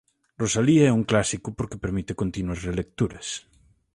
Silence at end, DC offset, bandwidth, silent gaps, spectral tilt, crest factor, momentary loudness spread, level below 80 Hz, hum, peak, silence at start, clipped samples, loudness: 0.55 s; under 0.1%; 11.5 kHz; none; -5.5 dB/octave; 18 dB; 13 LU; -44 dBFS; none; -6 dBFS; 0.4 s; under 0.1%; -25 LUFS